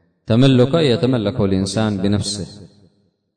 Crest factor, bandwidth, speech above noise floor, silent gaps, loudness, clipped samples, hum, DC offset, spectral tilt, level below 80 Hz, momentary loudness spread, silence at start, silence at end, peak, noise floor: 14 dB; 9.6 kHz; 45 dB; none; -17 LUFS; under 0.1%; none; under 0.1%; -6.5 dB/octave; -46 dBFS; 10 LU; 0.3 s; 0.7 s; -2 dBFS; -61 dBFS